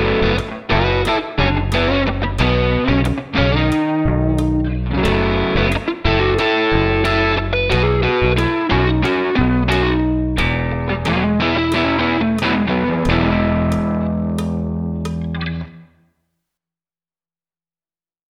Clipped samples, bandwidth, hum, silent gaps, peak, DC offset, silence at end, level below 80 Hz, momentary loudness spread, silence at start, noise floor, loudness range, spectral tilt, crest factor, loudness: under 0.1%; 12.5 kHz; none; none; 0 dBFS; under 0.1%; 2.5 s; -26 dBFS; 5 LU; 0 s; under -90 dBFS; 7 LU; -7 dB/octave; 16 dB; -17 LUFS